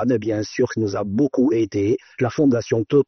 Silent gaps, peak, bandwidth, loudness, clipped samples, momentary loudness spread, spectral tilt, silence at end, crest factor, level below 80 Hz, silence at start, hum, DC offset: none; -6 dBFS; 6.4 kHz; -21 LUFS; under 0.1%; 5 LU; -7 dB/octave; 0.05 s; 14 dB; -56 dBFS; 0 s; none; under 0.1%